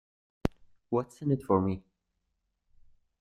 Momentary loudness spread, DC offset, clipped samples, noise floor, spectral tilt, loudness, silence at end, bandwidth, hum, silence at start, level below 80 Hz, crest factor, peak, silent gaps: 9 LU; under 0.1%; under 0.1%; -81 dBFS; -9 dB/octave; -32 LUFS; 1.4 s; 12 kHz; none; 0.45 s; -54 dBFS; 24 dB; -10 dBFS; none